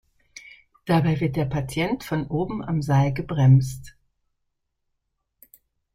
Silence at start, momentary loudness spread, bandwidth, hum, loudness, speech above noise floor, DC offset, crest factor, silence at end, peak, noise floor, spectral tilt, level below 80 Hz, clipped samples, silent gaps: 0.35 s; 19 LU; 15 kHz; none; -23 LUFS; 55 dB; under 0.1%; 18 dB; 2.05 s; -6 dBFS; -77 dBFS; -7.5 dB/octave; -48 dBFS; under 0.1%; none